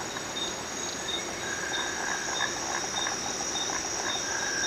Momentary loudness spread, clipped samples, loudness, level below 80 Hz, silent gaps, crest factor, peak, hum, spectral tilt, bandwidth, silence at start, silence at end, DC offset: 3 LU; under 0.1%; -30 LUFS; -58 dBFS; none; 16 dB; -16 dBFS; none; -0.5 dB/octave; 15.5 kHz; 0 s; 0 s; under 0.1%